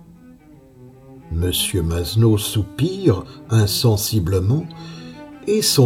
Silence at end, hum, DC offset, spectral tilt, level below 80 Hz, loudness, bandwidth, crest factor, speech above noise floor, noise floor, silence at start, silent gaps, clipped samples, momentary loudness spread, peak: 0 s; none; under 0.1%; -5 dB/octave; -38 dBFS; -19 LUFS; 17 kHz; 18 dB; 28 dB; -46 dBFS; 0.3 s; none; under 0.1%; 16 LU; -2 dBFS